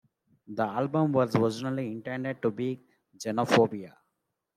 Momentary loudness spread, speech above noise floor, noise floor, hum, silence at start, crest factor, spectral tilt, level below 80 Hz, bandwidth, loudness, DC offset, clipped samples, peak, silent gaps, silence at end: 15 LU; 53 dB; -81 dBFS; none; 0.5 s; 22 dB; -6.5 dB/octave; -72 dBFS; 14.5 kHz; -28 LUFS; under 0.1%; under 0.1%; -8 dBFS; none; 0.65 s